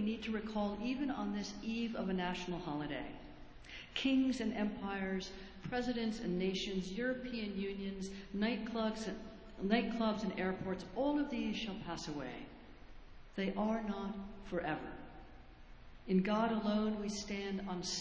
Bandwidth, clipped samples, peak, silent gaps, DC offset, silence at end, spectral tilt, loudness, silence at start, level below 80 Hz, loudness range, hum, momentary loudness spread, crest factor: 8 kHz; under 0.1%; -18 dBFS; none; under 0.1%; 0 s; -5.5 dB/octave; -39 LUFS; 0 s; -58 dBFS; 4 LU; none; 15 LU; 20 dB